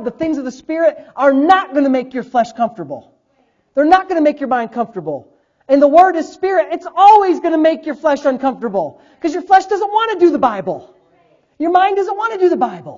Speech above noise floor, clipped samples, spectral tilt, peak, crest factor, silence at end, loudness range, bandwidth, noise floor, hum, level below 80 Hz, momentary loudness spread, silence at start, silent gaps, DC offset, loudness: 46 dB; 0.1%; -5.5 dB/octave; 0 dBFS; 14 dB; 0 s; 4 LU; 7.6 kHz; -60 dBFS; none; -56 dBFS; 13 LU; 0 s; none; under 0.1%; -14 LUFS